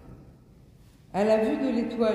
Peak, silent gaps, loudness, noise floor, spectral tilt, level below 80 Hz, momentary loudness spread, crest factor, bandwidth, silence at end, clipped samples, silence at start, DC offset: -12 dBFS; none; -26 LUFS; -54 dBFS; -6.5 dB/octave; -56 dBFS; 5 LU; 16 dB; 12 kHz; 0 s; under 0.1%; 0.05 s; under 0.1%